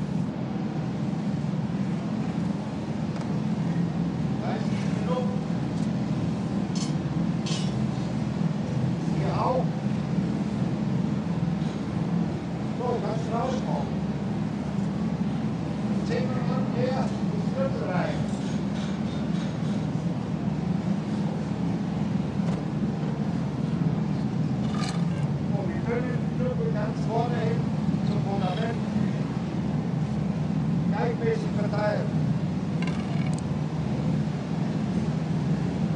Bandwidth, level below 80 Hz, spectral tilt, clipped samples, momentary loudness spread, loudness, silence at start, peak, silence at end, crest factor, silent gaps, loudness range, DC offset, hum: 10 kHz; -48 dBFS; -7.5 dB/octave; under 0.1%; 3 LU; -28 LUFS; 0 s; -12 dBFS; 0 s; 14 dB; none; 2 LU; under 0.1%; none